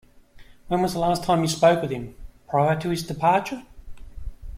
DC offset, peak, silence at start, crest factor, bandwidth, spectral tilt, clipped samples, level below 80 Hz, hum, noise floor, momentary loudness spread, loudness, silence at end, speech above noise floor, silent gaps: under 0.1%; -4 dBFS; 0.4 s; 20 dB; 16 kHz; -5.5 dB/octave; under 0.1%; -42 dBFS; none; -48 dBFS; 20 LU; -23 LUFS; 0 s; 26 dB; none